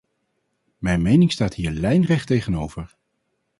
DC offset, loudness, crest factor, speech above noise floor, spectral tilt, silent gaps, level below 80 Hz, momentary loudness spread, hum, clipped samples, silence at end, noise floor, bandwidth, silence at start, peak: under 0.1%; -20 LUFS; 18 dB; 54 dB; -7 dB/octave; none; -40 dBFS; 14 LU; none; under 0.1%; 0.75 s; -73 dBFS; 11.5 kHz; 0.8 s; -4 dBFS